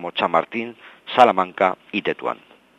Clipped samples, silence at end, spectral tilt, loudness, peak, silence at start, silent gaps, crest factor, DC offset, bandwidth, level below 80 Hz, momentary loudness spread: under 0.1%; 0.45 s; -5.5 dB/octave; -20 LUFS; 0 dBFS; 0 s; none; 22 dB; under 0.1%; 9.8 kHz; -70 dBFS; 17 LU